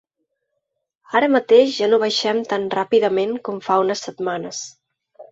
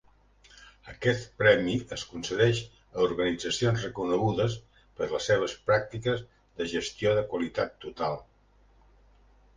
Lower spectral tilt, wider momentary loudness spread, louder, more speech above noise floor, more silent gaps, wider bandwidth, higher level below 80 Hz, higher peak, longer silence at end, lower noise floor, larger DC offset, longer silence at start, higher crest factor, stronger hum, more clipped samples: second, -3.5 dB/octave vs -5 dB/octave; about the same, 12 LU vs 10 LU; first, -19 LUFS vs -28 LUFS; first, 58 dB vs 34 dB; neither; second, 8 kHz vs 9.8 kHz; second, -68 dBFS vs -56 dBFS; first, -2 dBFS vs -6 dBFS; second, 0.1 s vs 1.35 s; first, -77 dBFS vs -61 dBFS; neither; first, 1.1 s vs 0.6 s; second, 18 dB vs 24 dB; second, none vs 50 Hz at -55 dBFS; neither